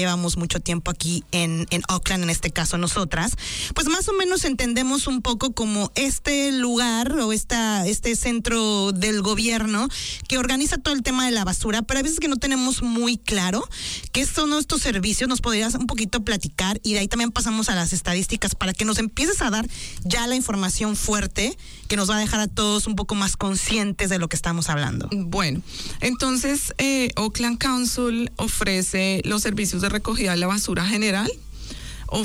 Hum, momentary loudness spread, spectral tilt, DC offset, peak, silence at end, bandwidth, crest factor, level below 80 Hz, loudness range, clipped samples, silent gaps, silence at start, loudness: none; 4 LU; -3.5 dB/octave; under 0.1%; -10 dBFS; 0 s; 19.5 kHz; 12 dB; -36 dBFS; 1 LU; under 0.1%; none; 0 s; -22 LUFS